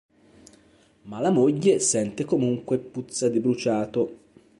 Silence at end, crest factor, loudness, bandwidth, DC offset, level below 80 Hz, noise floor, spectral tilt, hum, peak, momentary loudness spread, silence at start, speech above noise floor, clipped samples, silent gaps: 0.45 s; 18 dB; -24 LUFS; 11.5 kHz; under 0.1%; -64 dBFS; -58 dBFS; -5 dB/octave; none; -8 dBFS; 8 LU; 1.05 s; 35 dB; under 0.1%; none